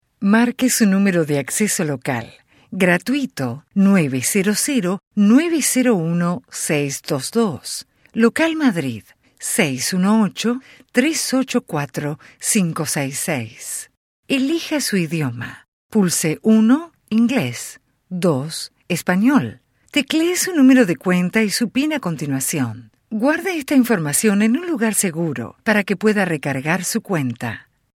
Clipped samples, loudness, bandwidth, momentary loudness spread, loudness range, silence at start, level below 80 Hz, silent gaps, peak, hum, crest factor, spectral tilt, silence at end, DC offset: under 0.1%; -18 LUFS; 16.5 kHz; 12 LU; 4 LU; 0.2 s; -62 dBFS; 5.07-5.11 s, 13.97-14.23 s, 15.68-15.90 s; 0 dBFS; none; 18 dB; -4.5 dB/octave; 0.35 s; under 0.1%